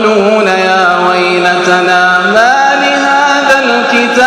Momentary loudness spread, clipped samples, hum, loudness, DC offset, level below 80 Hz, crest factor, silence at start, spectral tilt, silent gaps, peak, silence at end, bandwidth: 2 LU; 2%; none; -7 LUFS; under 0.1%; -52 dBFS; 8 dB; 0 s; -3.5 dB/octave; none; 0 dBFS; 0 s; 15 kHz